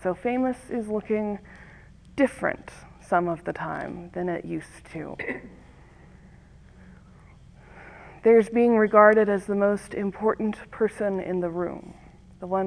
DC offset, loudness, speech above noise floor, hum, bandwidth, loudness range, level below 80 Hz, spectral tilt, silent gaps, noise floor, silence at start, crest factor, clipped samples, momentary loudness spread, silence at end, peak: under 0.1%; -24 LUFS; 26 dB; none; 11 kHz; 15 LU; -54 dBFS; -7.5 dB/octave; none; -50 dBFS; 0 s; 22 dB; under 0.1%; 19 LU; 0 s; -2 dBFS